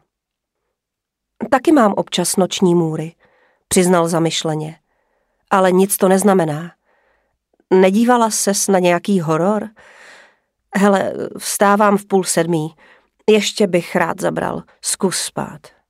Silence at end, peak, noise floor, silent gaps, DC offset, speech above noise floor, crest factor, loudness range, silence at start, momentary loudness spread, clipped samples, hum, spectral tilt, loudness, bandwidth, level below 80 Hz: 0.25 s; 0 dBFS; -81 dBFS; none; under 0.1%; 65 dB; 16 dB; 2 LU; 1.4 s; 11 LU; under 0.1%; none; -4.5 dB/octave; -16 LUFS; 16 kHz; -58 dBFS